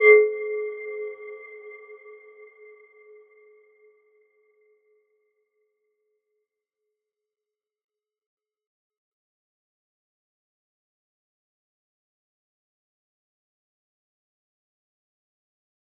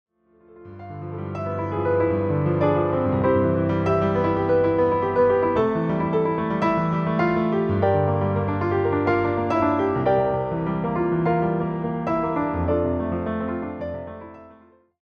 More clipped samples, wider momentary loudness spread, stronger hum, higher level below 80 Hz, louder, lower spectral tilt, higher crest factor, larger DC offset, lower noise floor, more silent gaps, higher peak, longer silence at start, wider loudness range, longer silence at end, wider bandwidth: neither; first, 30 LU vs 9 LU; neither; second, under -90 dBFS vs -48 dBFS; about the same, -23 LUFS vs -22 LUFS; second, 8 dB/octave vs -9.5 dB/octave; first, 28 dB vs 14 dB; neither; first, -90 dBFS vs -53 dBFS; neither; first, -4 dBFS vs -8 dBFS; second, 0 s vs 0.55 s; first, 27 LU vs 4 LU; first, 13.9 s vs 0.5 s; second, 3.4 kHz vs 6.6 kHz